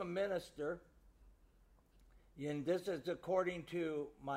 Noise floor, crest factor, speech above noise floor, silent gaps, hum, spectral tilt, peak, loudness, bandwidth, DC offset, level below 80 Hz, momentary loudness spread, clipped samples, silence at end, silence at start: -69 dBFS; 18 dB; 29 dB; none; none; -6.5 dB/octave; -24 dBFS; -41 LUFS; 15.5 kHz; under 0.1%; -68 dBFS; 7 LU; under 0.1%; 0 s; 0 s